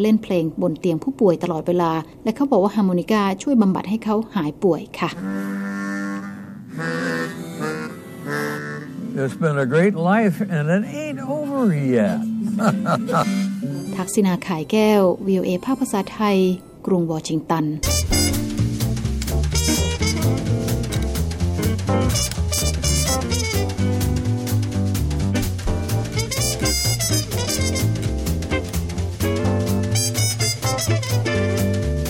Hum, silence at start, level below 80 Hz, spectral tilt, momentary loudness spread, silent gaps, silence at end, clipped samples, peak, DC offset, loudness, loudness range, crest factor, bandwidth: none; 0 s; -32 dBFS; -5 dB/octave; 8 LU; none; 0 s; under 0.1%; -4 dBFS; under 0.1%; -21 LUFS; 5 LU; 16 dB; 17 kHz